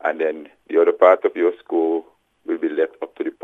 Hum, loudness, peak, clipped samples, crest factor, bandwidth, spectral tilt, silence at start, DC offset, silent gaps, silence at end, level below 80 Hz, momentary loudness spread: none; -20 LUFS; 0 dBFS; under 0.1%; 20 dB; 3.9 kHz; -6 dB/octave; 0.05 s; under 0.1%; none; 0.1 s; -76 dBFS; 14 LU